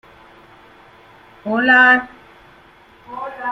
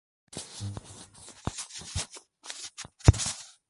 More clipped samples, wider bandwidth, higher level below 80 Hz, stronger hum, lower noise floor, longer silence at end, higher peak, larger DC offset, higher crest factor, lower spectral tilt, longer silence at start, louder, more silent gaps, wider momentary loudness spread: neither; second, 7.6 kHz vs 11.5 kHz; second, -60 dBFS vs -38 dBFS; neither; about the same, -47 dBFS vs -50 dBFS; second, 0 s vs 0.2 s; about the same, -2 dBFS vs -4 dBFS; neither; second, 18 dB vs 28 dB; about the same, -5 dB/octave vs -4.5 dB/octave; first, 1.45 s vs 0.35 s; first, -13 LUFS vs -31 LUFS; neither; about the same, 24 LU vs 22 LU